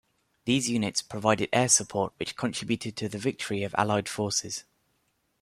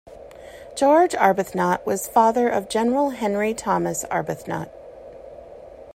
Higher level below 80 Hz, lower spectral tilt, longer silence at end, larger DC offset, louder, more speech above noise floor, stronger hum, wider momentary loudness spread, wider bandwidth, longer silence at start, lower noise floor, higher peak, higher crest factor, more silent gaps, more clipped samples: second, -64 dBFS vs -56 dBFS; second, -3.5 dB/octave vs -5 dB/octave; first, 0.8 s vs 0.05 s; neither; second, -27 LUFS vs -21 LUFS; first, 45 dB vs 21 dB; neither; second, 10 LU vs 24 LU; second, 14 kHz vs 16 kHz; first, 0.45 s vs 0.05 s; first, -73 dBFS vs -42 dBFS; about the same, -6 dBFS vs -4 dBFS; about the same, 22 dB vs 18 dB; neither; neither